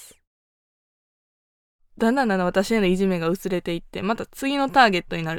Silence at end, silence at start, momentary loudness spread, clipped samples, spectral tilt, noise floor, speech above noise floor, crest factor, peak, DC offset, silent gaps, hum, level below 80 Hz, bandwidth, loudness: 0 s; 0 s; 10 LU; under 0.1%; -5.5 dB/octave; under -90 dBFS; over 68 dB; 20 dB; -4 dBFS; under 0.1%; 0.27-1.79 s; none; -48 dBFS; 18 kHz; -22 LUFS